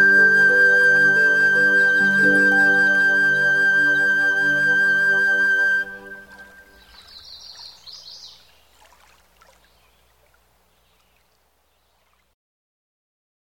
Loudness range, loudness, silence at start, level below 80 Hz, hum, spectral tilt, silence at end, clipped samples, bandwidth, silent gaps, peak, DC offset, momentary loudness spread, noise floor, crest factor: 9 LU; -15 LUFS; 0 s; -62 dBFS; none; -3.5 dB/octave; 5.3 s; under 0.1%; 16 kHz; none; -6 dBFS; under 0.1%; 15 LU; -65 dBFS; 14 dB